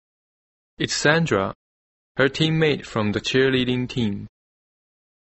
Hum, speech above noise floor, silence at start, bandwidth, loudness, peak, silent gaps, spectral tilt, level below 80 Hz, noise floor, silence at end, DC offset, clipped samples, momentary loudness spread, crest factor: none; over 69 dB; 0.8 s; 8.2 kHz; -21 LUFS; -2 dBFS; 1.55-2.15 s; -5 dB/octave; -52 dBFS; under -90 dBFS; 1 s; under 0.1%; under 0.1%; 10 LU; 20 dB